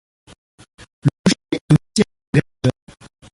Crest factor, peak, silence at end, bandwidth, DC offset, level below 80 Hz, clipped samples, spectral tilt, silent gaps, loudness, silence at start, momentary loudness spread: 18 dB; -2 dBFS; 0.65 s; 11.5 kHz; under 0.1%; -46 dBFS; under 0.1%; -6 dB/octave; 1.19-1.24 s, 1.61-1.68 s, 2.27-2.33 s; -19 LUFS; 1.05 s; 6 LU